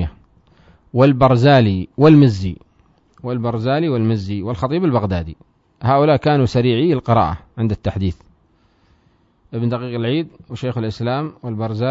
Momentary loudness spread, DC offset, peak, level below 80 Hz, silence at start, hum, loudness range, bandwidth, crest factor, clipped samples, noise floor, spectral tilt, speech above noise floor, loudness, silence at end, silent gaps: 14 LU; under 0.1%; 0 dBFS; -42 dBFS; 0 s; none; 9 LU; 7.8 kHz; 16 dB; under 0.1%; -57 dBFS; -8.5 dB/octave; 41 dB; -17 LUFS; 0 s; none